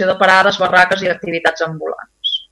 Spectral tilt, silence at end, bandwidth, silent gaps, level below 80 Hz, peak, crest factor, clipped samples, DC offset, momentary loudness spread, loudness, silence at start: -3.5 dB/octave; 0.1 s; 12 kHz; none; -54 dBFS; 0 dBFS; 14 dB; under 0.1%; under 0.1%; 11 LU; -14 LUFS; 0 s